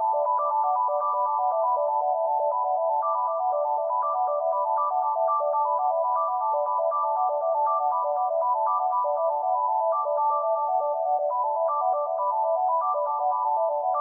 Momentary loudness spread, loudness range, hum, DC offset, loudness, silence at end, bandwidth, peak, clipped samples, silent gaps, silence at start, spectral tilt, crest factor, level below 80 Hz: 2 LU; 1 LU; none; under 0.1%; -25 LUFS; 0 s; 1.8 kHz; -14 dBFS; under 0.1%; none; 0 s; -5 dB/octave; 10 dB; under -90 dBFS